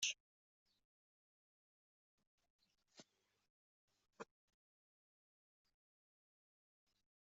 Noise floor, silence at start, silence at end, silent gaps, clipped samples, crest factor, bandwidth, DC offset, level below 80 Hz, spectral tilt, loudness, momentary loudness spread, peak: -70 dBFS; 0 s; 2.95 s; 0.20-0.66 s, 0.85-2.18 s, 2.27-2.38 s, 2.50-2.59 s, 3.50-3.88 s; under 0.1%; 30 dB; 7.4 kHz; under 0.1%; under -90 dBFS; 2 dB/octave; -50 LUFS; 19 LU; -28 dBFS